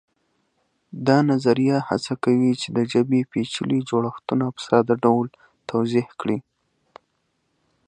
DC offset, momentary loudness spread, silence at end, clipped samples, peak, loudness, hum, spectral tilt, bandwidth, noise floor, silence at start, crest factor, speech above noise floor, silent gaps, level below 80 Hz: under 0.1%; 8 LU; 1.45 s; under 0.1%; -2 dBFS; -22 LUFS; none; -6.5 dB/octave; 9.6 kHz; -71 dBFS; 0.95 s; 20 dB; 51 dB; none; -64 dBFS